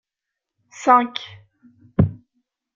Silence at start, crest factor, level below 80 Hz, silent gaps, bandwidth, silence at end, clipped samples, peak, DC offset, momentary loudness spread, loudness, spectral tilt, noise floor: 0.8 s; 20 dB; -46 dBFS; none; 7.6 kHz; 0.65 s; under 0.1%; -2 dBFS; under 0.1%; 16 LU; -19 LUFS; -6.5 dB/octave; -84 dBFS